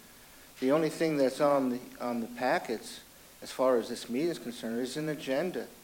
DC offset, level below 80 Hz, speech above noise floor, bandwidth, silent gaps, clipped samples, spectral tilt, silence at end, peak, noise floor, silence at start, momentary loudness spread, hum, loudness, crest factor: under 0.1%; -68 dBFS; 23 dB; 17 kHz; none; under 0.1%; -5 dB/octave; 0 s; -14 dBFS; -54 dBFS; 0 s; 11 LU; none; -31 LUFS; 16 dB